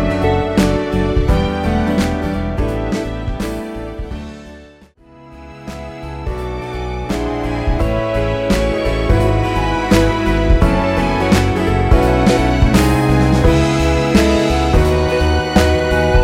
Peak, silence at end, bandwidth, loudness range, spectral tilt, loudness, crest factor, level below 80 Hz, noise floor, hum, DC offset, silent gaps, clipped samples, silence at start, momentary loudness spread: 0 dBFS; 0 s; 16 kHz; 13 LU; -6.5 dB/octave; -15 LUFS; 14 dB; -20 dBFS; -44 dBFS; none; under 0.1%; none; under 0.1%; 0 s; 13 LU